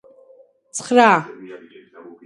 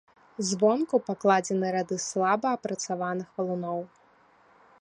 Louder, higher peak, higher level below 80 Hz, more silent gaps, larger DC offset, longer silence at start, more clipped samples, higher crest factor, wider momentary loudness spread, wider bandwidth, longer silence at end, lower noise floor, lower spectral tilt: first, -15 LUFS vs -28 LUFS; first, 0 dBFS vs -8 dBFS; about the same, -72 dBFS vs -74 dBFS; neither; neither; first, 0.75 s vs 0.4 s; neither; about the same, 20 dB vs 20 dB; first, 25 LU vs 9 LU; about the same, 11.5 kHz vs 11 kHz; second, 0.7 s vs 0.95 s; second, -51 dBFS vs -60 dBFS; about the same, -4 dB/octave vs -4.5 dB/octave